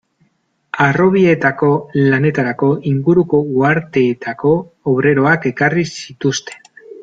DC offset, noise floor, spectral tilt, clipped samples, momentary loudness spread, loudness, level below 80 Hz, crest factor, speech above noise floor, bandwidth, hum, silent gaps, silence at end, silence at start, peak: under 0.1%; -62 dBFS; -6.5 dB/octave; under 0.1%; 7 LU; -15 LUFS; -52 dBFS; 14 dB; 48 dB; 7.8 kHz; none; none; 0.05 s; 0.75 s; 0 dBFS